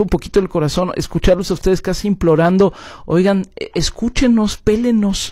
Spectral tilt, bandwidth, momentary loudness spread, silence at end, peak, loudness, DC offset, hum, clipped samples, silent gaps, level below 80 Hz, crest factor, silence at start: -6 dB/octave; 15 kHz; 6 LU; 0 s; -4 dBFS; -16 LUFS; under 0.1%; none; under 0.1%; none; -28 dBFS; 12 dB; 0 s